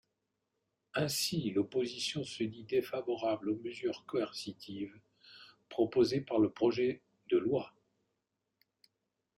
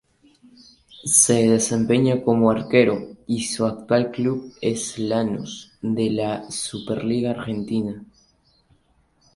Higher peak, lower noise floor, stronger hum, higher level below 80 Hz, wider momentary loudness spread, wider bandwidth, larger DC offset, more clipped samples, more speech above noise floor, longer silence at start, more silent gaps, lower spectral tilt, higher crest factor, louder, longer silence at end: second, -16 dBFS vs -2 dBFS; first, -85 dBFS vs -62 dBFS; neither; second, -74 dBFS vs -56 dBFS; about the same, 13 LU vs 11 LU; first, 14.5 kHz vs 11.5 kHz; neither; neither; first, 51 dB vs 41 dB; about the same, 0.95 s vs 0.95 s; neither; about the same, -5 dB/octave vs -4.5 dB/octave; about the same, 18 dB vs 22 dB; second, -35 LUFS vs -21 LUFS; first, 1.7 s vs 1.3 s